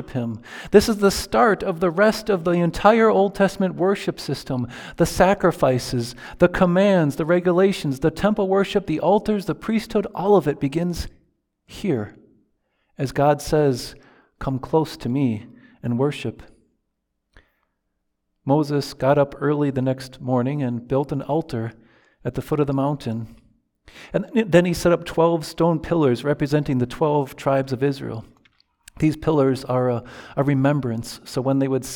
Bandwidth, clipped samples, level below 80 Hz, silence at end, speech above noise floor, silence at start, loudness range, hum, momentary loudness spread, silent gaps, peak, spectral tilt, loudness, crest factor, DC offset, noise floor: 19.5 kHz; under 0.1%; -46 dBFS; 0 s; 55 dB; 0 s; 7 LU; none; 12 LU; none; 0 dBFS; -6.5 dB/octave; -21 LUFS; 22 dB; under 0.1%; -76 dBFS